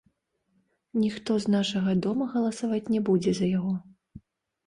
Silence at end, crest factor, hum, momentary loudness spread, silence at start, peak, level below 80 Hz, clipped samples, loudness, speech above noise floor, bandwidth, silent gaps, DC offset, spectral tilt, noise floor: 0.5 s; 14 dB; none; 5 LU; 0.95 s; -14 dBFS; -62 dBFS; under 0.1%; -27 LUFS; 47 dB; 11 kHz; none; under 0.1%; -6.5 dB/octave; -73 dBFS